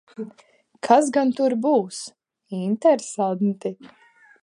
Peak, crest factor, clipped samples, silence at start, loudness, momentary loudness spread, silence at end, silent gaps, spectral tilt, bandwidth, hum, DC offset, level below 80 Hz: -2 dBFS; 20 dB; under 0.1%; 0.2 s; -21 LUFS; 18 LU; 0.55 s; none; -5.5 dB/octave; 11.5 kHz; none; under 0.1%; -78 dBFS